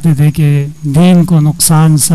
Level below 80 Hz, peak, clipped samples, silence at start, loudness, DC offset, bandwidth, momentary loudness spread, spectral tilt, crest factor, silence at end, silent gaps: -36 dBFS; 0 dBFS; under 0.1%; 0 s; -8 LUFS; under 0.1%; 15 kHz; 5 LU; -5.5 dB/octave; 8 dB; 0 s; none